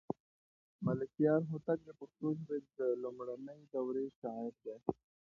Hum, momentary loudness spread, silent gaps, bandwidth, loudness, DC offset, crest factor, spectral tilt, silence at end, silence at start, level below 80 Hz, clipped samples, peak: none; 13 LU; 0.20-0.79 s, 4.16-4.22 s; 6.8 kHz; -39 LUFS; under 0.1%; 20 dB; -10 dB/octave; 0.4 s; 0.1 s; -76 dBFS; under 0.1%; -18 dBFS